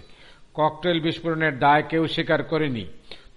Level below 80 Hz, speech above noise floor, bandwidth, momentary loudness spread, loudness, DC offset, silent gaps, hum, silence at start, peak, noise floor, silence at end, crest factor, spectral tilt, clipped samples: -52 dBFS; 25 dB; 11 kHz; 11 LU; -23 LUFS; under 0.1%; none; none; 0.1 s; -8 dBFS; -48 dBFS; 0.2 s; 16 dB; -7 dB/octave; under 0.1%